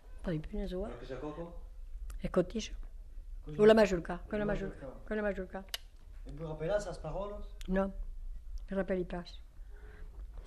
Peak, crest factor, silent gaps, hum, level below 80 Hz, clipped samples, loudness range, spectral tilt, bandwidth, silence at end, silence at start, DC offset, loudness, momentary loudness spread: -12 dBFS; 22 dB; none; none; -44 dBFS; under 0.1%; 8 LU; -6 dB/octave; 13 kHz; 0 s; 0 s; under 0.1%; -35 LUFS; 22 LU